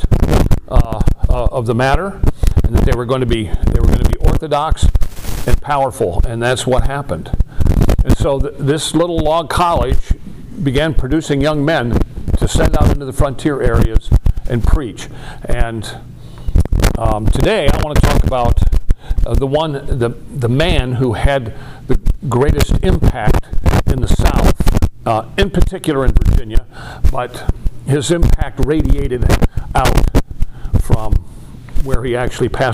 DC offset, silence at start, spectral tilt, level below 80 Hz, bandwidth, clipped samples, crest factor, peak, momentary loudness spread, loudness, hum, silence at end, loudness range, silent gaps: under 0.1%; 0 s; -6.5 dB/octave; -16 dBFS; 15.5 kHz; 0.2%; 12 dB; 0 dBFS; 8 LU; -16 LUFS; none; 0 s; 2 LU; none